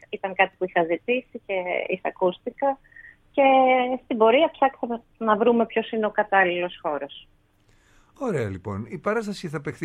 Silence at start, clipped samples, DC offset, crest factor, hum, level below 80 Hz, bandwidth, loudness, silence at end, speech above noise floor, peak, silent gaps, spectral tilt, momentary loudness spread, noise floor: 0.1 s; under 0.1%; under 0.1%; 22 dB; none; -62 dBFS; 10.5 kHz; -23 LUFS; 0 s; 37 dB; -2 dBFS; none; -6 dB/octave; 13 LU; -60 dBFS